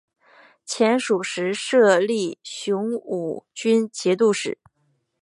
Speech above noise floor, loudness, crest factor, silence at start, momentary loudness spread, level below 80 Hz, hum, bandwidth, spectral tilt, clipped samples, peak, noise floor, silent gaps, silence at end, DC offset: 48 dB; -22 LUFS; 18 dB; 0.65 s; 13 LU; -76 dBFS; none; 11.5 kHz; -4 dB/octave; under 0.1%; -4 dBFS; -69 dBFS; none; 0.65 s; under 0.1%